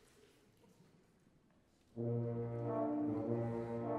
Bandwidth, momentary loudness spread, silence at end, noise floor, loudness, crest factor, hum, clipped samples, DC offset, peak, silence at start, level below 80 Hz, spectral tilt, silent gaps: 5.6 kHz; 4 LU; 0 s; -72 dBFS; -40 LUFS; 16 dB; none; under 0.1%; under 0.1%; -26 dBFS; 1.95 s; -72 dBFS; -10.5 dB/octave; none